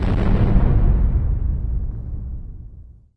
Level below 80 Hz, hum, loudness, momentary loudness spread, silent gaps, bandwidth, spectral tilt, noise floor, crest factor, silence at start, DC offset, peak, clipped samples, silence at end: -20 dBFS; none; -21 LUFS; 18 LU; none; 4.5 kHz; -10 dB/octave; -41 dBFS; 16 dB; 0 s; under 0.1%; -2 dBFS; under 0.1%; 0.3 s